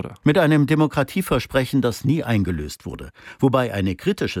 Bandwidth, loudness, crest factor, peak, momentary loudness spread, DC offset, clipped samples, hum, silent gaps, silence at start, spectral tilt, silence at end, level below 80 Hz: 17 kHz; -20 LUFS; 16 dB; -6 dBFS; 15 LU; under 0.1%; under 0.1%; none; none; 0 s; -6.5 dB/octave; 0 s; -42 dBFS